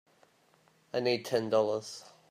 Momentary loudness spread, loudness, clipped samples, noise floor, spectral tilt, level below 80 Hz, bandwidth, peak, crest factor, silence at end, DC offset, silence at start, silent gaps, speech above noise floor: 14 LU; -31 LUFS; under 0.1%; -67 dBFS; -4.5 dB/octave; -78 dBFS; 15.5 kHz; -14 dBFS; 18 dB; 0.2 s; under 0.1%; 0.95 s; none; 36 dB